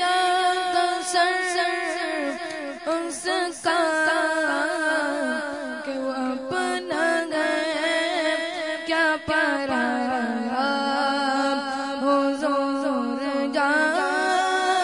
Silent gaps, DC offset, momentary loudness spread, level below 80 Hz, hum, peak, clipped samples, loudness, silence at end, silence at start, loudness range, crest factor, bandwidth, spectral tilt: none; under 0.1%; 7 LU; -64 dBFS; none; -8 dBFS; under 0.1%; -23 LUFS; 0 s; 0 s; 2 LU; 16 dB; 11 kHz; -2 dB/octave